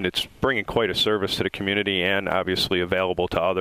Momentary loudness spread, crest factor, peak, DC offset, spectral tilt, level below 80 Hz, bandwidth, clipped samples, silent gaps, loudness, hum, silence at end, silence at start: 3 LU; 18 dB; -6 dBFS; under 0.1%; -4.5 dB/octave; -48 dBFS; 16 kHz; under 0.1%; none; -23 LUFS; none; 0 s; 0 s